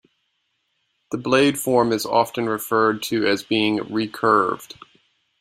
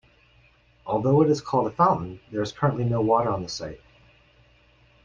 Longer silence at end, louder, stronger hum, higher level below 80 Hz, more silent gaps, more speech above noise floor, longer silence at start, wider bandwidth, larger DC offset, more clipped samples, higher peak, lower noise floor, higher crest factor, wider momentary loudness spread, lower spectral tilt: second, 0.75 s vs 1.3 s; first, -20 LUFS vs -24 LUFS; neither; second, -62 dBFS vs -54 dBFS; neither; first, 52 dB vs 35 dB; first, 1.1 s vs 0.85 s; first, 16 kHz vs 7.6 kHz; neither; neither; first, -2 dBFS vs -8 dBFS; first, -72 dBFS vs -59 dBFS; about the same, 20 dB vs 18 dB; second, 9 LU vs 13 LU; second, -4.5 dB/octave vs -7 dB/octave